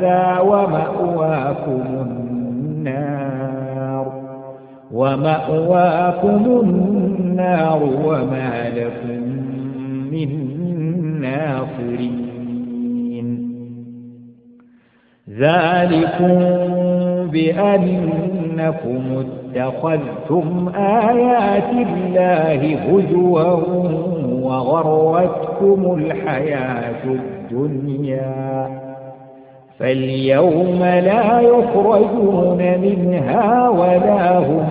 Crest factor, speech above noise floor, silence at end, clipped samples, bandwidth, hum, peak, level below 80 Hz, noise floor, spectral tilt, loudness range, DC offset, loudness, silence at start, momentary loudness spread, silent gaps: 16 dB; 39 dB; 0 s; under 0.1%; 4.8 kHz; none; 0 dBFS; -52 dBFS; -55 dBFS; -12.5 dB/octave; 9 LU; under 0.1%; -17 LUFS; 0 s; 11 LU; none